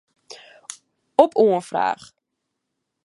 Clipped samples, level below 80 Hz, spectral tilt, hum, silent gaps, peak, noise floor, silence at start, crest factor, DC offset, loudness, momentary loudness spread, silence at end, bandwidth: under 0.1%; -72 dBFS; -5 dB/octave; none; none; 0 dBFS; -79 dBFS; 0.3 s; 22 dB; under 0.1%; -19 LUFS; 22 LU; 1.1 s; 11.5 kHz